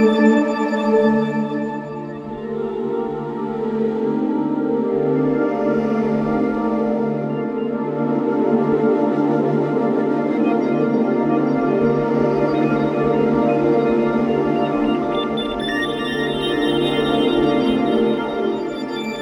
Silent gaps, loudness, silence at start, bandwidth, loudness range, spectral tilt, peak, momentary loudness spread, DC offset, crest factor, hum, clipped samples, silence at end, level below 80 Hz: none; -19 LUFS; 0 s; 12 kHz; 4 LU; -7.5 dB/octave; -2 dBFS; 7 LU; under 0.1%; 16 dB; none; under 0.1%; 0 s; -48 dBFS